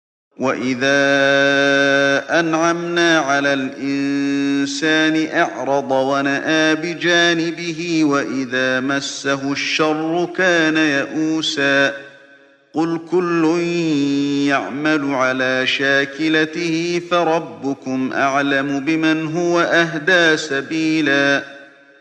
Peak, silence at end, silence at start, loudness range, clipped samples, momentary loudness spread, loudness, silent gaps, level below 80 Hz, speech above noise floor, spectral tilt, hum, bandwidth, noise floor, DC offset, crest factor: -2 dBFS; 0.35 s; 0.4 s; 3 LU; under 0.1%; 7 LU; -17 LUFS; none; -64 dBFS; 31 dB; -4 dB/octave; none; 9.2 kHz; -48 dBFS; under 0.1%; 16 dB